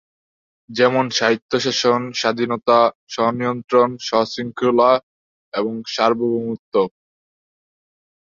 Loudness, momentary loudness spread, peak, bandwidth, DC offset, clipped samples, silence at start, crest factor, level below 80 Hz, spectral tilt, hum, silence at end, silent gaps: -19 LUFS; 8 LU; -2 dBFS; 7.6 kHz; under 0.1%; under 0.1%; 0.7 s; 18 dB; -64 dBFS; -4.5 dB/octave; none; 1.4 s; 1.42-1.49 s, 2.95-3.07 s, 5.03-5.52 s, 6.59-6.72 s